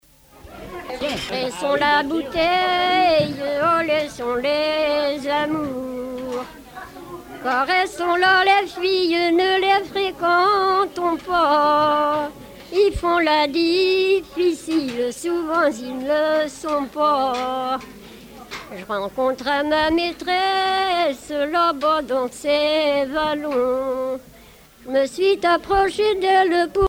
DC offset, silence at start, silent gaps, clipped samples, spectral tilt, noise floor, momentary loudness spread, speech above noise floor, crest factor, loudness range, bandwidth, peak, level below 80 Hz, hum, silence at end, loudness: under 0.1%; 0.45 s; none; under 0.1%; -4 dB/octave; -47 dBFS; 12 LU; 27 dB; 16 dB; 5 LU; 17 kHz; -4 dBFS; -48 dBFS; none; 0 s; -20 LUFS